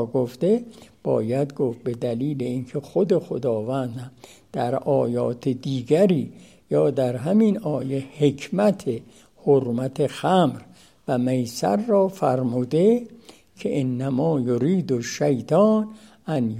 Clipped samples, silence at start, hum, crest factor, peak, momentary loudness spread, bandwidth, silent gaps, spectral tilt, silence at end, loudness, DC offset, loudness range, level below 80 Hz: under 0.1%; 0 s; none; 18 dB; -6 dBFS; 10 LU; 15.5 kHz; none; -7.5 dB/octave; 0 s; -23 LUFS; under 0.1%; 3 LU; -64 dBFS